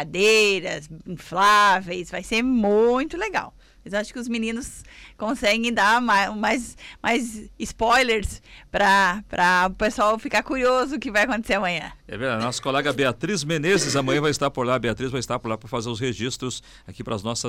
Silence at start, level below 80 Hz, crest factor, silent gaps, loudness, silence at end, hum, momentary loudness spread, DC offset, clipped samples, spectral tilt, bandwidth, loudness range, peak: 0 s; -46 dBFS; 12 dB; none; -22 LUFS; 0 s; none; 14 LU; under 0.1%; under 0.1%; -4 dB/octave; 16.5 kHz; 4 LU; -10 dBFS